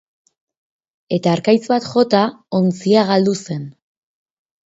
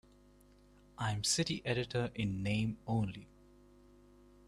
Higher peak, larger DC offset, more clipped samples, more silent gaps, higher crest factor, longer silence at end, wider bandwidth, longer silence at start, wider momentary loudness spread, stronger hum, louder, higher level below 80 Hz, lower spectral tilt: first, 0 dBFS vs -20 dBFS; neither; neither; neither; about the same, 18 dB vs 18 dB; second, 1 s vs 1.2 s; second, 8 kHz vs 13.5 kHz; about the same, 1.1 s vs 1 s; about the same, 10 LU vs 8 LU; second, none vs 50 Hz at -55 dBFS; first, -17 LUFS vs -36 LUFS; about the same, -64 dBFS vs -60 dBFS; first, -6.5 dB/octave vs -4.5 dB/octave